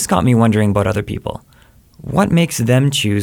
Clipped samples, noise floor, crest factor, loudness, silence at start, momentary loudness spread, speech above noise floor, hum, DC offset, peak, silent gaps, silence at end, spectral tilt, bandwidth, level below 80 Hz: under 0.1%; -48 dBFS; 14 dB; -15 LUFS; 0 s; 14 LU; 33 dB; none; under 0.1%; 0 dBFS; none; 0 s; -5.5 dB/octave; 18 kHz; -40 dBFS